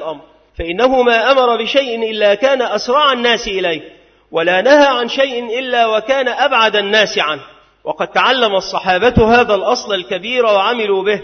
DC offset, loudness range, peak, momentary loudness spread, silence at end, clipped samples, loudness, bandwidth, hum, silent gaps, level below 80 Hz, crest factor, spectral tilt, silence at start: under 0.1%; 1 LU; 0 dBFS; 9 LU; 0 s; under 0.1%; -13 LUFS; 6.6 kHz; none; none; -38 dBFS; 14 dB; -4 dB/octave; 0 s